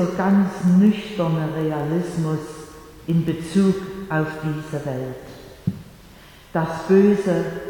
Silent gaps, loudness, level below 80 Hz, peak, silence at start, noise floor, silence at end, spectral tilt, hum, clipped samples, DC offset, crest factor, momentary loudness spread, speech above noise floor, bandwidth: none; -21 LUFS; -50 dBFS; -4 dBFS; 0 s; -45 dBFS; 0 s; -8 dB/octave; none; under 0.1%; under 0.1%; 16 dB; 17 LU; 25 dB; 18 kHz